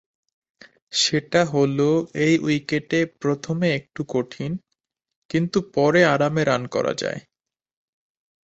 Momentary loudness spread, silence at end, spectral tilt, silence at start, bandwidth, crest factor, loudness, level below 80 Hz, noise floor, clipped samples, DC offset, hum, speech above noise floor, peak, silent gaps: 10 LU; 1.25 s; -5 dB/octave; 0.9 s; 8.2 kHz; 20 dB; -22 LUFS; -60 dBFS; -78 dBFS; under 0.1%; under 0.1%; none; 57 dB; -4 dBFS; 5.16-5.29 s